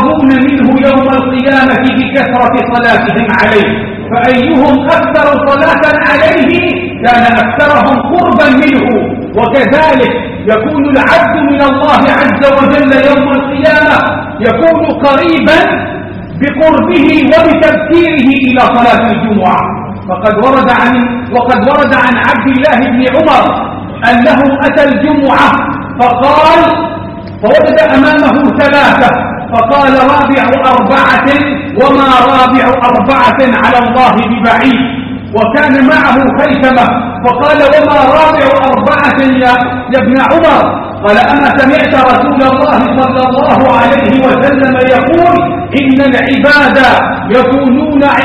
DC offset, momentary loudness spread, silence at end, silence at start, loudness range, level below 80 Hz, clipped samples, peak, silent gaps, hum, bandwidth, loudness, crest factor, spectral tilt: under 0.1%; 6 LU; 0 s; 0 s; 2 LU; -34 dBFS; 2%; 0 dBFS; none; none; 9 kHz; -7 LUFS; 6 dB; -7 dB/octave